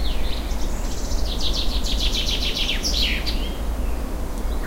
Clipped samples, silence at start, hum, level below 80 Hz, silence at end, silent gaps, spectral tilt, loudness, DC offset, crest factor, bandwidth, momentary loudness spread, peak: under 0.1%; 0 s; none; -24 dBFS; 0 s; none; -3.5 dB/octave; -24 LUFS; under 0.1%; 14 dB; 16 kHz; 8 LU; -8 dBFS